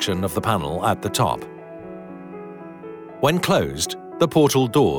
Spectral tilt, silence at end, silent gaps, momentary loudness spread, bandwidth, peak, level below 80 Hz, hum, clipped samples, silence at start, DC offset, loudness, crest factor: -5 dB/octave; 0 s; none; 20 LU; 18 kHz; -6 dBFS; -50 dBFS; none; under 0.1%; 0 s; under 0.1%; -21 LUFS; 16 dB